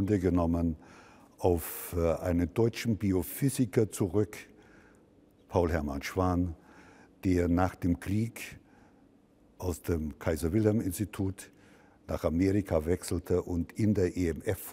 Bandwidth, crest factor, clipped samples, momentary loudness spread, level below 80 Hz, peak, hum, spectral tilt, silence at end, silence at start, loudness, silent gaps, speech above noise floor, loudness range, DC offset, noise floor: 16 kHz; 20 dB; under 0.1%; 9 LU; -52 dBFS; -12 dBFS; none; -7 dB/octave; 0 s; 0 s; -31 LUFS; none; 33 dB; 3 LU; under 0.1%; -62 dBFS